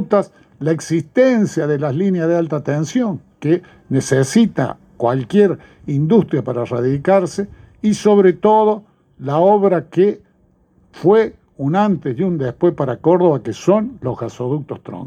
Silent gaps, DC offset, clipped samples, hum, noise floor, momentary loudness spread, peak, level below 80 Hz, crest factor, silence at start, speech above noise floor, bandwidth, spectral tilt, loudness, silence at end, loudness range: none; under 0.1%; under 0.1%; none; -56 dBFS; 11 LU; -2 dBFS; -54 dBFS; 16 dB; 0 s; 40 dB; 13 kHz; -7 dB/octave; -17 LUFS; 0 s; 2 LU